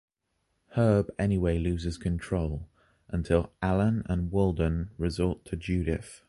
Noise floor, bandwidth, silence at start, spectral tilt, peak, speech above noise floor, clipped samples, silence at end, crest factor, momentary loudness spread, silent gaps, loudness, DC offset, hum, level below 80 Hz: -77 dBFS; 11.5 kHz; 0.7 s; -8 dB/octave; -10 dBFS; 50 dB; under 0.1%; 0.15 s; 18 dB; 9 LU; none; -29 LUFS; under 0.1%; none; -40 dBFS